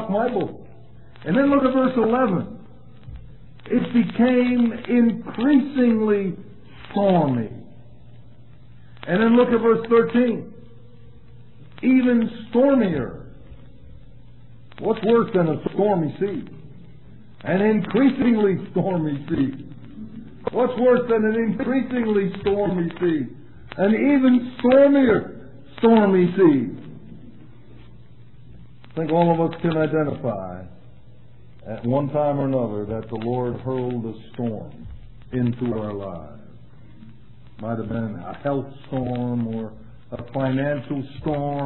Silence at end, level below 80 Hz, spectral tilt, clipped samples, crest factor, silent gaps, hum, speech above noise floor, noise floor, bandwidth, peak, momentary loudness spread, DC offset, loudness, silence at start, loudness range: 0 s; -50 dBFS; -11.5 dB/octave; under 0.1%; 18 dB; none; none; 28 dB; -48 dBFS; 4.2 kHz; -4 dBFS; 19 LU; 0.8%; -21 LUFS; 0 s; 9 LU